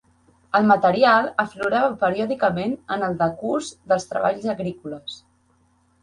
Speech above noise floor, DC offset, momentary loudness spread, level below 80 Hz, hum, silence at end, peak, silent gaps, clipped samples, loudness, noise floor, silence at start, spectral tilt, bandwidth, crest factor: 41 dB; under 0.1%; 14 LU; -60 dBFS; none; 0.85 s; -4 dBFS; none; under 0.1%; -21 LUFS; -62 dBFS; 0.55 s; -5.5 dB/octave; 11 kHz; 18 dB